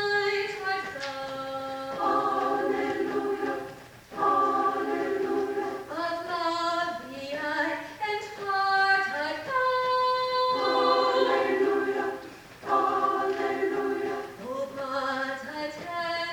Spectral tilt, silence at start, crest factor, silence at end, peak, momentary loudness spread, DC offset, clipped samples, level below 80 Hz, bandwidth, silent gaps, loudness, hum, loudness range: -4 dB/octave; 0 s; 18 dB; 0 s; -10 dBFS; 11 LU; under 0.1%; under 0.1%; -66 dBFS; 19 kHz; none; -28 LUFS; none; 5 LU